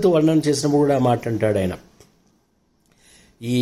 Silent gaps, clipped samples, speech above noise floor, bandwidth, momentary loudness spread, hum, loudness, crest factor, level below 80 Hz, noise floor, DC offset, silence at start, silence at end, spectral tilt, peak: none; under 0.1%; 46 dB; 15 kHz; 11 LU; none; -19 LUFS; 14 dB; -56 dBFS; -64 dBFS; under 0.1%; 0 s; 0 s; -6.5 dB/octave; -6 dBFS